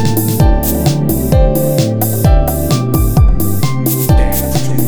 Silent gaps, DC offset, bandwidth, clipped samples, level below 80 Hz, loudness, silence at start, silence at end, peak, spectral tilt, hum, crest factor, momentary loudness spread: none; under 0.1%; over 20 kHz; under 0.1%; -16 dBFS; -12 LUFS; 0 s; 0 s; 0 dBFS; -6 dB/octave; none; 10 dB; 3 LU